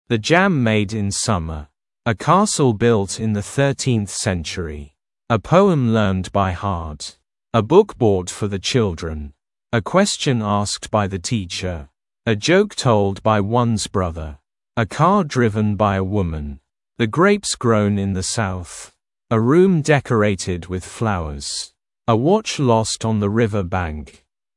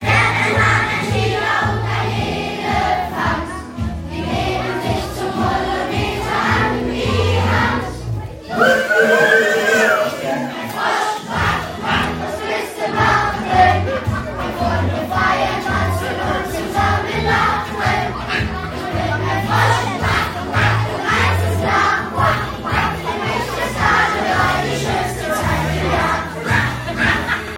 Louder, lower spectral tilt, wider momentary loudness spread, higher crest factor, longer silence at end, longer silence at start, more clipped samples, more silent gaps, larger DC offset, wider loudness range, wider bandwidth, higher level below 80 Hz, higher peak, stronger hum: about the same, -19 LUFS vs -17 LUFS; about the same, -5.5 dB/octave vs -5 dB/octave; first, 13 LU vs 8 LU; about the same, 18 dB vs 16 dB; first, 0.5 s vs 0 s; about the same, 0.1 s vs 0 s; neither; neither; neither; about the same, 2 LU vs 4 LU; second, 12 kHz vs 16.5 kHz; second, -42 dBFS vs -34 dBFS; about the same, 0 dBFS vs 0 dBFS; neither